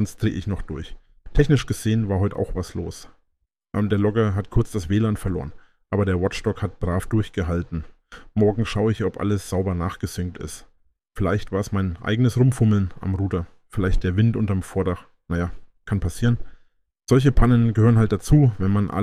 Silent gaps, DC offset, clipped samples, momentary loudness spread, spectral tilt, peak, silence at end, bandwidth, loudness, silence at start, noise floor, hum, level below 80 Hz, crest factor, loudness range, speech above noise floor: none; under 0.1%; under 0.1%; 13 LU; -7.5 dB/octave; -4 dBFS; 0 s; 14 kHz; -22 LUFS; 0 s; -72 dBFS; none; -32 dBFS; 18 dB; 4 LU; 52 dB